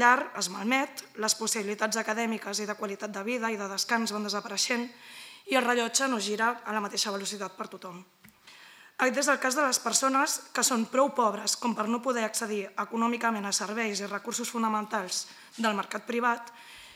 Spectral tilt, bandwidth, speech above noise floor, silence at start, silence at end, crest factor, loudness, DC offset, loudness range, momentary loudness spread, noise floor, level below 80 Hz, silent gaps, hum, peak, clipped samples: -2 dB/octave; 16.5 kHz; 24 dB; 0 s; 0 s; 24 dB; -29 LUFS; under 0.1%; 4 LU; 10 LU; -54 dBFS; -86 dBFS; none; none; -6 dBFS; under 0.1%